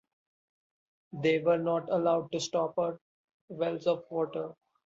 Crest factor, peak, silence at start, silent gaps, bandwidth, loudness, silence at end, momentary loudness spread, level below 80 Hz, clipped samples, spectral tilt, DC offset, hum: 18 dB; -16 dBFS; 1.15 s; 3.01-3.48 s; 7.8 kHz; -31 LUFS; 0.35 s; 14 LU; -76 dBFS; under 0.1%; -5.5 dB/octave; under 0.1%; none